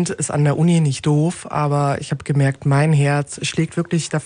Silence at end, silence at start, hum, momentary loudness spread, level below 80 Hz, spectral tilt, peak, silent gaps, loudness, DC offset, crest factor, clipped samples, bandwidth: 0 s; 0 s; none; 6 LU; -52 dBFS; -6 dB/octave; -4 dBFS; none; -18 LUFS; under 0.1%; 14 dB; under 0.1%; 10.5 kHz